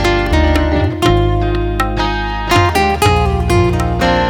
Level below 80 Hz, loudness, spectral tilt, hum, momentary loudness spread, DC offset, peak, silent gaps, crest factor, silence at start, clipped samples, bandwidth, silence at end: -20 dBFS; -14 LUFS; -6 dB/octave; none; 5 LU; under 0.1%; 0 dBFS; none; 12 dB; 0 s; under 0.1%; 19 kHz; 0 s